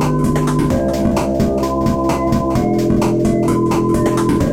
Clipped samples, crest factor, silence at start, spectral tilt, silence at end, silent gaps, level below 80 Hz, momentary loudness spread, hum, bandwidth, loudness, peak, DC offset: under 0.1%; 10 dB; 0 s; -7 dB/octave; 0 s; none; -30 dBFS; 2 LU; none; 16.5 kHz; -16 LUFS; -4 dBFS; under 0.1%